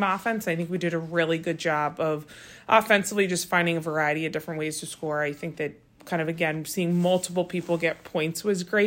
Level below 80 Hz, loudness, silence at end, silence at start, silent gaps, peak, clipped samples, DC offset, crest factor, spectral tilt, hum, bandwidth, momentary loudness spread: -66 dBFS; -26 LUFS; 0 s; 0 s; none; -6 dBFS; under 0.1%; under 0.1%; 20 dB; -4.5 dB/octave; none; 16.5 kHz; 9 LU